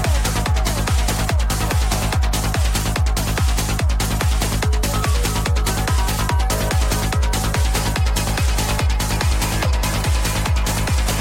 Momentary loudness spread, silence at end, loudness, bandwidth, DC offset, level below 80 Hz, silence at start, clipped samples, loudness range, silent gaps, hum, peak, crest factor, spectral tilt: 1 LU; 0 s; -20 LUFS; 16.5 kHz; under 0.1%; -20 dBFS; 0 s; under 0.1%; 0 LU; none; none; -4 dBFS; 14 dB; -4 dB/octave